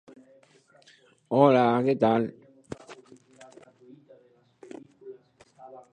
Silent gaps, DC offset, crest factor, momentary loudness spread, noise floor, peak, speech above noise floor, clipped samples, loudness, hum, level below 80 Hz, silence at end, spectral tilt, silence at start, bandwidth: none; under 0.1%; 24 dB; 28 LU; -60 dBFS; -6 dBFS; 38 dB; under 0.1%; -23 LUFS; none; -70 dBFS; 0.15 s; -8 dB/octave; 1.3 s; 9.4 kHz